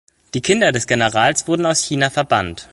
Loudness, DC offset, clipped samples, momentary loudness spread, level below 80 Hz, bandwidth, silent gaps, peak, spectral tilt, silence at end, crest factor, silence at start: -16 LUFS; under 0.1%; under 0.1%; 4 LU; -46 dBFS; 11.5 kHz; none; 0 dBFS; -3.5 dB/octave; 0.1 s; 16 dB; 0.35 s